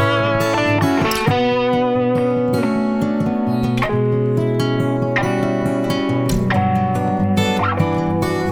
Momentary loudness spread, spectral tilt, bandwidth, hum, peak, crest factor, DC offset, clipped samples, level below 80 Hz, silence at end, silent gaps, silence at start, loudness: 2 LU; -6.5 dB/octave; 19.5 kHz; none; -2 dBFS; 16 dB; under 0.1%; under 0.1%; -40 dBFS; 0 s; none; 0 s; -18 LUFS